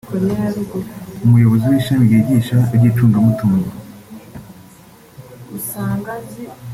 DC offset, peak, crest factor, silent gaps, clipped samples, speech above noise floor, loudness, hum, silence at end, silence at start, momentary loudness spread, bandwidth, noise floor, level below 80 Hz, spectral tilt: under 0.1%; -2 dBFS; 14 dB; none; under 0.1%; 28 dB; -15 LUFS; none; 0 s; 0.05 s; 23 LU; 15.5 kHz; -43 dBFS; -48 dBFS; -8 dB/octave